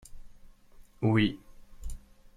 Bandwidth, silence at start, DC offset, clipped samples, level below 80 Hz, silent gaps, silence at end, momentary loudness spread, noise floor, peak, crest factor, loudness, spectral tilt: 13 kHz; 0.1 s; under 0.1%; under 0.1%; -46 dBFS; none; 0.4 s; 23 LU; -54 dBFS; -14 dBFS; 20 dB; -28 LUFS; -7 dB/octave